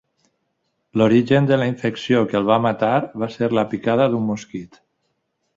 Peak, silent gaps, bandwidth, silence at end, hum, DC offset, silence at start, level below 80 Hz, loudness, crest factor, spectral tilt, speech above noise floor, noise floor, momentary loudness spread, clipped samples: -2 dBFS; none; 7.8 kHz; 0.9 s; none; under 0.1%; 0.95 s; -58 dBFS; -19 LUFS; 18 dB; -7.5 dB/octave; 53 dB; -72 dBFS; 11 LU; under 0.1%